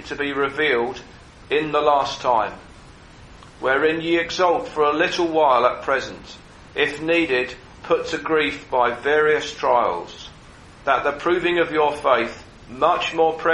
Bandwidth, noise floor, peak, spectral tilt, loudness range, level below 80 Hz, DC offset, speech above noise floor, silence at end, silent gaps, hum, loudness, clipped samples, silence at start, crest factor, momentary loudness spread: 11 kHz; -44 dBFS; -2 dBFS; -4 dB/octave; 2 LU; -50 dBFS; under 0.1%; 24 dB; 0 s; none; none; -20 LUFS; under 0.1%; 0 s; 18 dB; 12 LU